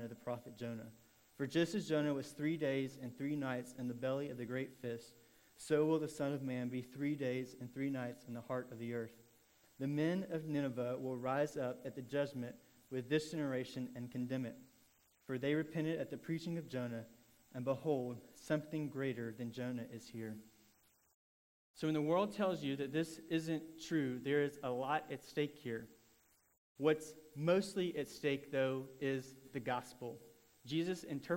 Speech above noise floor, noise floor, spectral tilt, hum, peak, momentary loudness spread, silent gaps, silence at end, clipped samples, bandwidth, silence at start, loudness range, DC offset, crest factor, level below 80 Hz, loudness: 33 dB; -73 dBFS; -6.5 dB/octave; none; -20 dBFS; 12 LU; 21.14-21.74 s, 26.58-26.75 s; 0 s; under 0.1%; 16 kHz; 0 s; 4 LU; under 0.1%; 20 dB; -78 dBFS; -41 LUFS